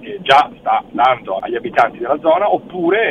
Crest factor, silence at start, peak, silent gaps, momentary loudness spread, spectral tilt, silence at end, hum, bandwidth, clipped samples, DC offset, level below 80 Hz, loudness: 16 dB; 0 s; 0 dBFS; none; 7 LU; -5 dB/octave; 0 s; none; 10 kHz; under 0.1%; under 0.1%; -54 dBFS; -15 LUFS